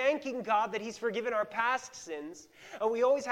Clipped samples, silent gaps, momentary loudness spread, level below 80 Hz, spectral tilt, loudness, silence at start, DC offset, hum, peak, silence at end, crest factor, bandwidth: under 0.1%; none; 14 LU; -76 dBFS; -3.5 dB/octave; -32 LUFS; 0 s; under 0.1%; none; -14 dBFS; 0 s; 18 dB; 15.5 kHz